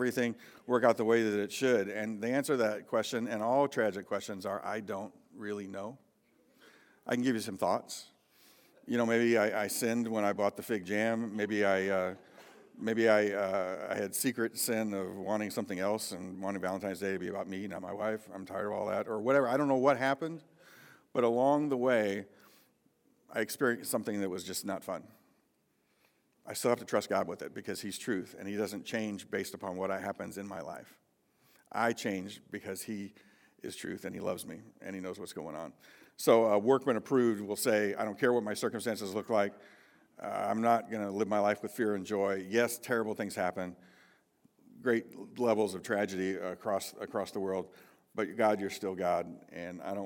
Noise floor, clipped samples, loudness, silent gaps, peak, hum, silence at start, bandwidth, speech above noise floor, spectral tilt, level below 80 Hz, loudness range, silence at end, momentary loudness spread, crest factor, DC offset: -75 dBFS; under 0.1%; -33 LUFS; none; -12 dBFS; none; 0 s; 18 kHz; 42 dB; -4.5 dB/octave; -84 dBFS; 8 LU; 0 s; 14 LU; 22 dB; under 0.1%